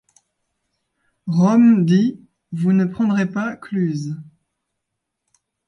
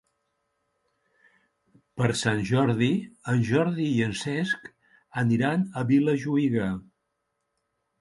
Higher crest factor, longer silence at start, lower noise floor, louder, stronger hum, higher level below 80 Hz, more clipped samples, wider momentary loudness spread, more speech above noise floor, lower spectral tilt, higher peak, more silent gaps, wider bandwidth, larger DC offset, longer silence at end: about the same, 16 dB vs 20 dB; second, 1.25 s vs 1.95 s; about the same, -79 dBFS vs -79 dBFS; first, -18 LUFS vs -26 LUFS; neither; second, -64 dBFS vs -58 dBFS; neither; first, 17 LU vs 7 LU; first, 62 dB vs 54 dB; first, -8 dB/octave vs -6.5 dB/octave; about the same, -4 dBFS vs -6 dBFS; neither; second, 7 kHz vs 11.5 kHz; neither; first, 1.45 s vs 1.2 s